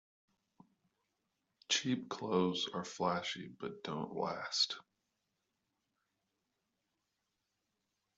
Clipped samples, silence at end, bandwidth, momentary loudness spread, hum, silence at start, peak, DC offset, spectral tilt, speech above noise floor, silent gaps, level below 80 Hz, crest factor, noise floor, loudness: under 0.1%; 3.35 s; 8.2 kHz; 10 LU; none; 1.7 s; -20 dBFS; under 0.1%; -3.5 dB/octave; 48 dB; none; -82 dBFS; 22 dB; -86 dBFS; -37 LUFS